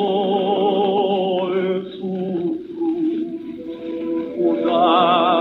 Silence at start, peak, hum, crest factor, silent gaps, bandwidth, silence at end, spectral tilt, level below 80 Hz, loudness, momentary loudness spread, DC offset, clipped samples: 0 s; -4 dBFS; none; 16 dB; none; 4.7 kHz; 0 s; -8.5 dB/octave; -64 dBFS; -20 LUFS; 12 LU; under 0.1%; under 0.1%